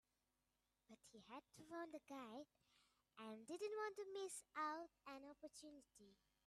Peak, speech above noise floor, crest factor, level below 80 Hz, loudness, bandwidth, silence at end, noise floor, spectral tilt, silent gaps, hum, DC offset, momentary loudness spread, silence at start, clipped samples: -38 dBFS; 35 dB; 18 dB; under -90 dBFS; -54 LUFS; 13.5 kHz; 0.35 s; -90 dBFS; -3 dB/octave; none; none; under 0.1%; 16 LU; 0.9 s; under 0.1%